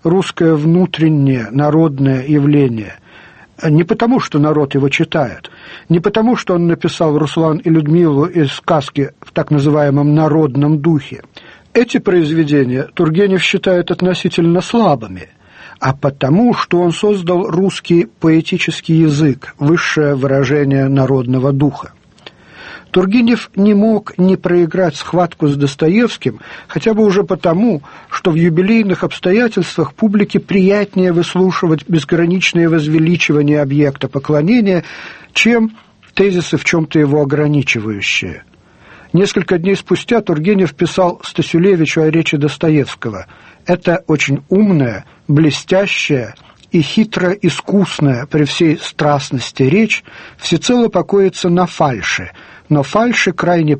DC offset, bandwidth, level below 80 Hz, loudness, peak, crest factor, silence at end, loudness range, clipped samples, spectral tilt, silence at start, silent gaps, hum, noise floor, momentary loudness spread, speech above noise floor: under 0.1%; 8.8 kHz; -48 dBFS; -13 LUFS; 0 dBFS; 12 dB; 0 s; 2 LU; under 0.1%; -6.5 dB/octave; 0.05 s; none; none; -42 dBFS; 7 LU; 29 dB